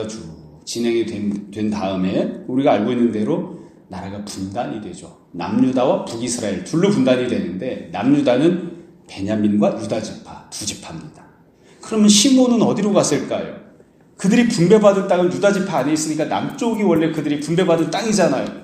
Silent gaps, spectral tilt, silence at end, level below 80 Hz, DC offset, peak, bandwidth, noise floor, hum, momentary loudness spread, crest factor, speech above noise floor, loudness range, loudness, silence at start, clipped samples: none; -5 dB/octave; 0 s; -56 dBFS; under 0.1%; 0 dBFS; 15 kHz; -49 dBFS; none; 18 LU; 18 dB; 31 dB; 6 LU; -18 LUFS; 0 s; under 0.1%